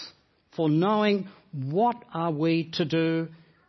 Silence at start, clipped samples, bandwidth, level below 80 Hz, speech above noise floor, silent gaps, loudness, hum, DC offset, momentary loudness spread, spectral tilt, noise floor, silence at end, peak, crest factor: 0 s; under 0.1%; 6.2 kHz; -72 dBFS; 30 dB; none; -26 LUFS; none; under 0.1%; 15 LU; -7.5 dB/octave; -56 dBFS; 0.35 s; -10 dBFS; 16 dB